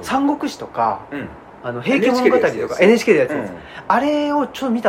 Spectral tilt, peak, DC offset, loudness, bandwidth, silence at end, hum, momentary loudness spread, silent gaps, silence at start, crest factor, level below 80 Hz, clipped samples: -5.5 dB/octave; 0 dBFS; under 0.1%; -17 LUFS; 16.5 kHz; 0 s; none; 16 LU; none; 0 s; 18 dB; -54 dBFS; under 0.1%